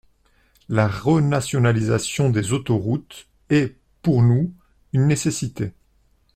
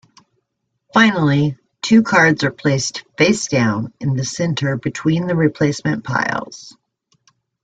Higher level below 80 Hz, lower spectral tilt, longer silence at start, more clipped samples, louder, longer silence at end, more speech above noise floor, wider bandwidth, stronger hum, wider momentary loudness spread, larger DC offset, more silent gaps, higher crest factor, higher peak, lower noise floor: about the same, -50 dBFS vs -54 dBFS; first, -6.5 dB/octave vs -5 dB/octave; second, 0.7 s vs 0.95 s; neither; second, -21 LUFS vs -17 LUFS; second, 0.65 s vs 0.95 s; second, 41 dB vs 57 dB; first, 13.5 kHz vs 9.2 kHz; neither; about the same, 10 LU vs 9 LU; neither; neither; about the same, 16 dB vs 16 dB; about the same, -4 dBFS vs -2 dBFS; second, -61 dBFS vs -73 dBFS